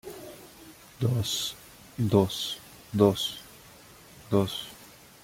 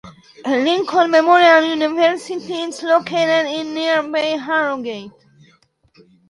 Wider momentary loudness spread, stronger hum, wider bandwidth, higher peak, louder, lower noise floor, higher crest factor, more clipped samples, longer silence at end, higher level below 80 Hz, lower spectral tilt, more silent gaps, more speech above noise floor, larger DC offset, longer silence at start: first, 25 LU vs 14 LU; neither; first, 16.5 kHz vs 11.5 kHz; second, -8 dBFS vs 0 dBFS; second, -28 LUFS vs -16 LUFS; second, -52 dBFS vs -56 dBFS; about the same, 22 dB vs 18 dB; neither; second, 0.35 s vs 1.2 s; first, -60 dBFS vs -66 dBFS; first, -5.5 dB/octave vs -3.5 dB/octave; neither; second, 26 dB vs 40 dB; neither; about the same, 0.05 s vs 0.05 s